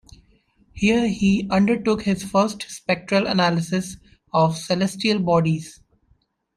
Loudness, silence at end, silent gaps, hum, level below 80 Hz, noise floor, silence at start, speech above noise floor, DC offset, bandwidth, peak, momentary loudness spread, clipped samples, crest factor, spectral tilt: -21 LUFS; 0.85 s; none; none; -50 dBFS; -64 dBFS; 0.75 s; 43 dB; under 0.1%; 13.5 kHz; -6 dBFS; 7 LU; under 0.1%; 16 dB; -5.5 dB/octave